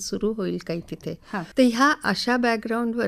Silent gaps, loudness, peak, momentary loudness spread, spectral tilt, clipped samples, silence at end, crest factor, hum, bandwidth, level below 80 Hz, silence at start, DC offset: none; -23 LUFS; -8 dBFS; 13 LU; -4.5 dB/octave; under 0.1%; 0 s; 16 dB; none; 14.5 kHz; -54 dBFS; 0 s; under 0.1%